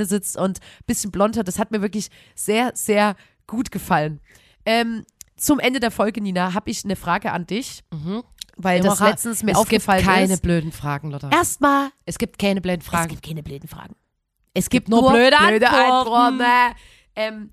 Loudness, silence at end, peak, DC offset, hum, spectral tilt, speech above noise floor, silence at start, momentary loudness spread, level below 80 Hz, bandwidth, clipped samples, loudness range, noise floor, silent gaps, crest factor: -19 LUFS; 0.05 s; -2 dBFS; under 0.1%; none; -4 dB/octave; 50 dB; 0 s; 15 LU; -44 dBFS; 15.5 kHz; under 0.1%; 7 LU; -70 dBFS; none; 18 dB